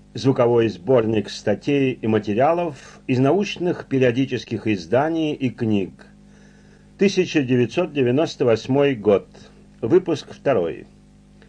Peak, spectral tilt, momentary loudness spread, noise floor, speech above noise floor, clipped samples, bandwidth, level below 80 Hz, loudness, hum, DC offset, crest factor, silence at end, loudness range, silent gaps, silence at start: -6 dBFS; -7 dB/octave; 6 LU; -49 dBFS; 29 dB; under 0.1%; 9.8 kHz; -54 dBFS; -20 LUFS; 50 Hz at -50 dBFS; under 0.1%; 16 dB; 0.7 s; 3 LU; none; 0.15 s